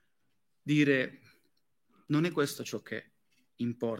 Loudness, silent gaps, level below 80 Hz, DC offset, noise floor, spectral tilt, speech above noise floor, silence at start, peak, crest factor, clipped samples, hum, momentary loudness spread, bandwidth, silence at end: -31 LUFS; none; -82 dBFS; under 0.1%; -82 dBFS; -6 dB/octave; 52 dB; 0.65 s; -14 dBFS; 20 dB; under 0.1%; none; 15 LU; 16.5 kHz; 0 s